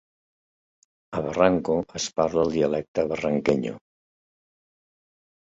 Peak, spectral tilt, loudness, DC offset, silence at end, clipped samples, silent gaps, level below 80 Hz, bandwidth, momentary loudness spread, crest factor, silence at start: -4 dBFS; -5.5 dB/octave; -25 LUFS; under 0.1%; 1.65 s; under 0.1%; 2.88-2.95 s; -54 dBFS; 8 kHz; 10 LU; 22 dB; 1.1 s